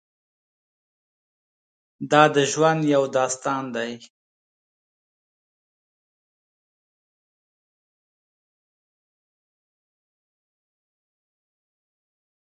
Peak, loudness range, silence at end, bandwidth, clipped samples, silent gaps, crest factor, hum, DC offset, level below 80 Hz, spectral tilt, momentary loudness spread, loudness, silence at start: -2 dBFS; 12 LU; 8.4 s; 9.4 kHz; under 0.1%; none; 28 dB; none; under 0.1%; -78 dBFS; -4.5 dB/octave; 15 LU; -20 LUFS; 2 s